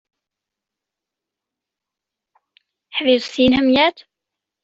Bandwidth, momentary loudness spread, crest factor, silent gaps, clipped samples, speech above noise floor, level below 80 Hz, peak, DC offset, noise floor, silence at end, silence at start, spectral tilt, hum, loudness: 7.8 kHz; 7 LU; 18 dB; none; under 0.1%; 69 dB; -54 dBFS; -2 dBFS; under 0.1%; -85 dBFS; 0.7 s; 2.95 s; -5 dB/octave; none; -16 LUFS